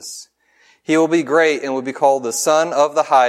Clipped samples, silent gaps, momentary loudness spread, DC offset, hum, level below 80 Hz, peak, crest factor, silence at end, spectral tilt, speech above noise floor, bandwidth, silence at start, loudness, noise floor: under 0.1%; none; 13 LU; under 0.1%; none; -74 dBFS; 0 dBFS; 16 dB; 0 s; -3.5 dB/octave; 39 dB; 15.5 kHz; 0 s; -16 LUFS; -55 dBFS